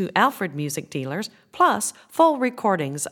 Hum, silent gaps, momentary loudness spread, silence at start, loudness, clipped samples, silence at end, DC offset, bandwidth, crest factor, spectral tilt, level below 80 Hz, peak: none; none; 10 LU; 0 s; -22 LUFS; under 0.1%; 0 s; under 0.1%; 19 kHz; 20 dB; -4 dB/octave; -72 dBFS; -2 dBFS